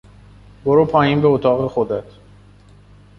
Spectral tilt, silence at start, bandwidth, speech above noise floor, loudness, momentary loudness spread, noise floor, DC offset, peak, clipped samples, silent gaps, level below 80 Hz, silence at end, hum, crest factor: -9 dB/octave; 0.65 s; 6 kHz; 30 dB; -17 LUFS; 10 LU; -46 dBFS; under 0.1%; -2 dBFS; under 0.1%; none; -48 dBFS; 1.15 s; 50 Hz at -40 dBFS; 16 dB